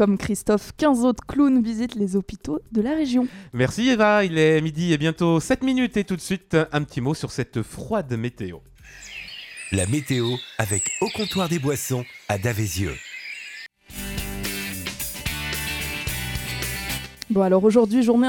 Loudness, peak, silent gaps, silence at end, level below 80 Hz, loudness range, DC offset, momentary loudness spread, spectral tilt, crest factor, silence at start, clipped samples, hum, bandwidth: -23 LUFS; -4 dBFS; none; 0 s; -44 dBFS; 8 LU; under 0.1%; 15 LU; -5 dB/octave; 18 dB; 0 s; under 0.1%; none; 17.5 kHz